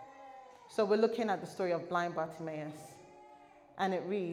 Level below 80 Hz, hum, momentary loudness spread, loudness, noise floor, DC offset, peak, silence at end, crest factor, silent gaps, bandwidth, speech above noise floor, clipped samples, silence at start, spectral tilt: -80 dBFS; none; 23 LU; -35 LUFS; -59 dBFS; under 0.1%; -18 dBFS; 0 s; 18 dB; none; 14.5 kHz; 24 dB; under 0.1%; 0 s; -6 dB/octave